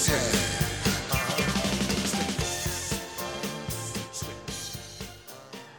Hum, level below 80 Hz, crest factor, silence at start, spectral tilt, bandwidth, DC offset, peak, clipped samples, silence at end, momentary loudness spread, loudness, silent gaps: none; -44 dBFS; 18 dB; 0 s; -3.5 dB/octave; over 20 kHz; under 0.1%; -12 dBFS; under 0.1%; 0 s; 14 LU; -29 LUFS; none